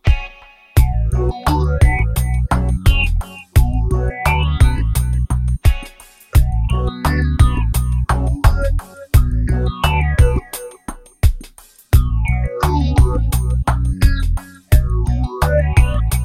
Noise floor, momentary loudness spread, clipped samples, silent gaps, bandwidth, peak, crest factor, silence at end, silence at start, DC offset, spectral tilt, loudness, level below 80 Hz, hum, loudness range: -42 dBFS; 7 LU; under 0.1%; none; 16 kHz; 0 dBFS; 14 dB; 0 s; 0.05 s; under 0.1%; -6 dB/octave; -17 LUFS; -16 dBFS; none; 2 LU